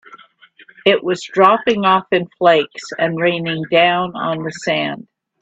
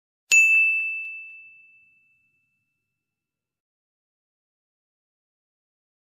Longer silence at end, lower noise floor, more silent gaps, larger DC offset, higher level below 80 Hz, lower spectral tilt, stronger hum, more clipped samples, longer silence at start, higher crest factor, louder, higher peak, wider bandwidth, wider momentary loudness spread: second, 0.45 s vs 4.7 s; second, -47 dBFS vs -88 dBFS; neither; neither; first, -60 dBFS vs -88 dBFS; first, -5 dB/octave vs 5 dB/octave; neither; neither; second, 0.1 s vs 0.3 s; second, 16 dB vs 22 dB; about the same, -16 LUFS vs -17 LUFS; first, 0 dBFS vs -6 dBFS; second, 8.4 kHz vs 14.5 kHz; second, 9 LU vs 23 LU